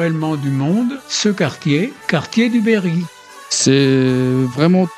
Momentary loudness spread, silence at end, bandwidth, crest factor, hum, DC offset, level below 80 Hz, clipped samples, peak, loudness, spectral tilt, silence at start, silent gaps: 7 LU; 0 s; 13.5 kHz; 16 dB; none; under 0.1%; -56 dBFS; under 0.1%; 0 dBFS; -16 LUFS; -5 dB/octave; 0 s; none